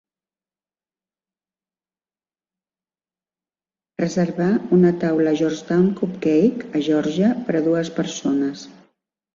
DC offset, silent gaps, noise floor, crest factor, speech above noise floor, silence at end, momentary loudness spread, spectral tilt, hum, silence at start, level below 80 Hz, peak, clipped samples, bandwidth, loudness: under 0.1%; none; under -90 dBFS; 16 dB; over 71 dB; 0.65 s; 7 LU; -7 dB/octave; none; 4 s; -62 dBFS; -6 dBFS; under 0.1%; 7.4 kHz; -20 LUFS